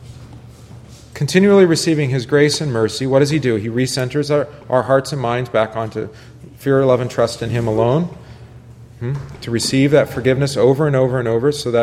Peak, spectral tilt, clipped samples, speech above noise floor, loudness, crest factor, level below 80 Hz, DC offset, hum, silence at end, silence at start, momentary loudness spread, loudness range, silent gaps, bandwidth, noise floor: 0 dBFS; -6 dB/octave; under 0.1%; 23 dB; -16 LUFS; 16 dB; -46 dBFS; under 0.1%; none; 0 s; 0 s; 12 LU; 4 LU; none; 14.5 kHz; -39 dBFS